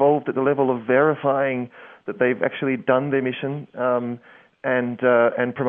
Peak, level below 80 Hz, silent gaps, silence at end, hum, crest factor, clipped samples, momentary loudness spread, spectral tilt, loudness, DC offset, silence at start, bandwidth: -4 dBFS; -70 dBFS; none; 0 s; none; 18 dB; under 0.1%; 12 LU; -10 dB/octave; -21 LUFS; under 0.1%; 0 s; 3.7 kHz